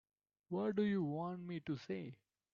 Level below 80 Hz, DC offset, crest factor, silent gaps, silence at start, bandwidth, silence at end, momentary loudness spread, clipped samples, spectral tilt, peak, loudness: -78 dBFS; under 0.1%; 16 dB; none; 0.5 s; 7 kHz; 0.4 s; 10 LU; under 0.1%; -7 dB/octave; -26 dBFS; -41 LUFS